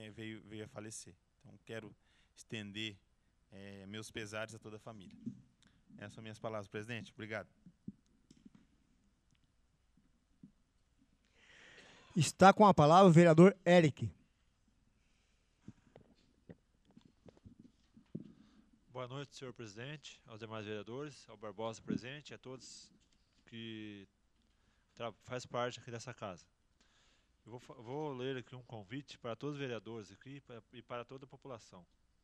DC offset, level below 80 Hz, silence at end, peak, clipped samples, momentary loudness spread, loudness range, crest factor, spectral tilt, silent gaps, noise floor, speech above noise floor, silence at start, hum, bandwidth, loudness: under 0.1%; -72 dBFS; 0.45 s; -12 dBFS; under 0.1%; 28 LU; 23 LU; 26 dB; -6 dB/octave; none; -75 dBFS; 39 dB; 0 s; none; 11.5 kHz; -33 LUFS